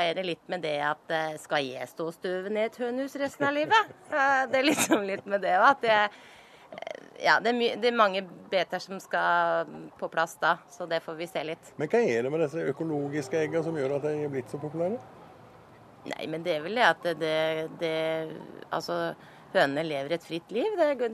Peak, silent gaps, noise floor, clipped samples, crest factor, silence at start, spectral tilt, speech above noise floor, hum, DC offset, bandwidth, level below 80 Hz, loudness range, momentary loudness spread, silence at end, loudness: -6 dBFS; none; -53 dBFS; under 0.1%; 22 dB; 0 s; -4 dB/octave; 25 dB; none; under 0.1%; 13.5 kHz; -76 dBFS; 6 LU; 12 LU; 0 s; -28 LUFS